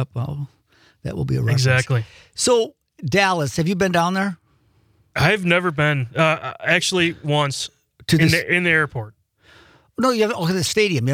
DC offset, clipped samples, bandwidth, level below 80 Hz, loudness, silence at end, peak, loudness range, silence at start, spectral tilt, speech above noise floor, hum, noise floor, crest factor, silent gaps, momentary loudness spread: under 0.1%; under 0.1%; 16.5 kHz; -52 dBFS; -19 LUFS; 0 s; -4 dBFS; 2 LU; 0 s; -4.5 dB/octave; 40 dB; none; -59 dBFS; 16 dB; none; 15 LU